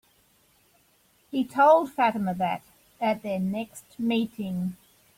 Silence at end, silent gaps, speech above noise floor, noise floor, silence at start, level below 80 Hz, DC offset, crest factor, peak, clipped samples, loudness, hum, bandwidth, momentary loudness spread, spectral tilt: 0.45 s; none; 39 dB; -64 dBFS; 1.35 s; -66 dBFS; under 0.1%; 18 dB; -8 dBFS; under 0.1%; -26 LUFS; none; 16.5 kHz; 15 LU; -6.5 dB/octave